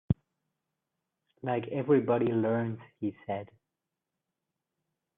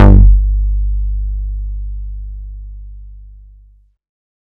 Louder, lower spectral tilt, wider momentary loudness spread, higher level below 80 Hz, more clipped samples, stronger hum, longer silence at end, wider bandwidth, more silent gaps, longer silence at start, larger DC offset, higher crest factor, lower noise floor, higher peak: second, -31 LUFS vs -16 LUFS; about the same, -11.5 dB/octave vs -10.5 dB/octave; second, 12 LU vs 25 LU; second, -60 dBFS vs -14 dBFS; second, under 0.1% vs 2%; second, none vs 50 Hz at -25 dBFS; first, 1.7 s vs 1.25 s; first, 3.9 kHz vs 2.7 kHz; neither; about the same, 0.1 s vs 0 s; neither; first, 22 dB vs 14 dB; first, -87 dBFS vs -47 dBFS; second, -12 dBFS vs 0 dBFS